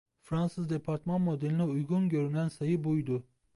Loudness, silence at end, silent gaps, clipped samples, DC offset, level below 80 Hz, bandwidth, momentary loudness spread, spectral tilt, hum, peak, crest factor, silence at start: -32 LUFS; 0.35 s; none; under 0.1%; under 0.1%; -64 dBFS; 11.5 kHz; 5 LU; -9 dB/octave; none; -20 dBFS; 12 dB; 0.3 s